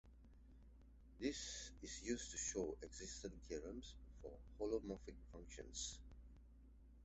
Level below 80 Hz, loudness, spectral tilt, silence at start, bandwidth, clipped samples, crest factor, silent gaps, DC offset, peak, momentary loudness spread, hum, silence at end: -60 dBFS; -49 LUFS; -3.5 dB/octave; 0.05 s; 8.2 kHz; under 0.1%; 20 dB; none; under 0.1%; -30 dBFS; 22 LU; none; 0 s